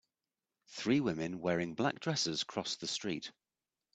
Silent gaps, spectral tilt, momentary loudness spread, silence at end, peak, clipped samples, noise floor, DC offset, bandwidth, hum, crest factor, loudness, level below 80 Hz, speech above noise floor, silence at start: none; -4 dB/octave; 8 LU; 0.65 s; -16 dBFS; under 0.1%; under -90 dBFS; under 0.1%; 9.2 kHz; none; 22 dB; -36 LUFS; -72 dBFS; over 54 dB; 0.7 s